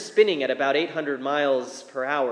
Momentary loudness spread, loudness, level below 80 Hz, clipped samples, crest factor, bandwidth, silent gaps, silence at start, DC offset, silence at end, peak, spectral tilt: 7 LU; -24 LUFS; under -90 dBFS; under 0.1%; 18 dB; 10.5 kHz; none; 0 s; under 0.1%; 0 s; -6 dBFS; -3.5 dB/octave